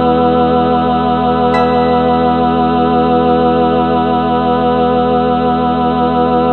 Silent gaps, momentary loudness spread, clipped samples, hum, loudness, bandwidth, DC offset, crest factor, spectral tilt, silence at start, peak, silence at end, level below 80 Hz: none; 2 LU; under 0.1%; none; -12 LUFS; 4.5 kHz; 1%; 10 dB; -9 dB/octave; 0 s; 0 dBFS; 0 s; -34 dBFS